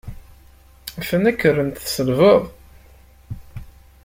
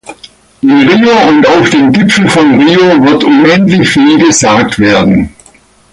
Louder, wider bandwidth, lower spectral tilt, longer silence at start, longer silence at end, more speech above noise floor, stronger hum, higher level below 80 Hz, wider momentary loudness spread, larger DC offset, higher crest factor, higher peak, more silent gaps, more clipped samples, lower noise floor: second, -18 LUFS vs -6 LUFS; first, 16.5 kHz vs 11.5 kHz; about the same, -5.5 dB/octave vs -4.5 dB/octave; about the same, 0.05 s vs 0.1 s; second, 0.4 s vs 0.65 s; second, 31 dB vs 36 dB; neither; second, -44 dBFS vs -36 dBFS; first, 24 LU vs 3 LU; neither; first, 18 dB vs 6 dB; about the same, -2 dBFS vs 0 dBFS; neither; neither; first, -48 dBFS vs -42 dBFS